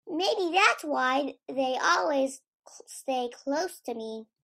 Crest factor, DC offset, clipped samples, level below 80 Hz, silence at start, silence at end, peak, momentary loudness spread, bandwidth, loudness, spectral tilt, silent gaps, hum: 22 dB; under 0.1%; under 0.1%; -82 dBFS; 0.05 s; 0.2 s; -8 dBFS; 15 LU; 15.5 kHz; -27 LUFS; -1.5 dB/octave; 2.48-2.60 s; none